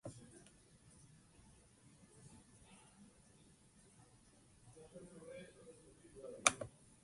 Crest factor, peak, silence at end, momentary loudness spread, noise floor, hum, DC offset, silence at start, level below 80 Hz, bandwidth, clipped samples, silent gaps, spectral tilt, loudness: 38 dB; -12 dBFS; 0.05 s; 26 LU; -68 dBFS; none; under 0.1%; 0.05 s; -74 dBFS; 11.5 kHz; under 0.1%; none; -1 dB/octave; -41 LUFS